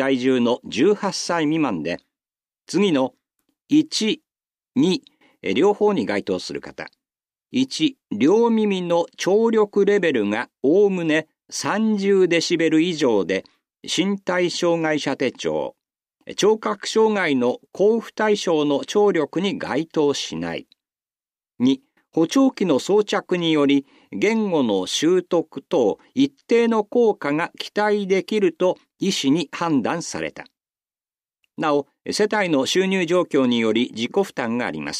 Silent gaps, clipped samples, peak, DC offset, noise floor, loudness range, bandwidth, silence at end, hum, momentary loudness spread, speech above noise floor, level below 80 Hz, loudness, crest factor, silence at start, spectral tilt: none; under 0.1%; -6 dBFS; under 0.1%; under -90 dBFS; 4 LU; 14 kHz; 0 s; none; 9 LU; over 70 dB; -68 dBFS; -21 LUFS; 14 dB; 0 s; -4.5 dB/octave